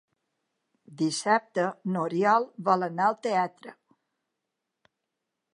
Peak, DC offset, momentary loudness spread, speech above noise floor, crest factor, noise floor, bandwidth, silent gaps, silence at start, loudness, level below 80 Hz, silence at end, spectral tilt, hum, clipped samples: -8 dBFS; under 0.1%; 6 LU; 58 dB; 20 dB; -84 dBFS; 11 kHz; none; 0.9 s; -27 LUFS; -84 dBFS; 1.8 s; -5 dB/octave; none; under 0.1%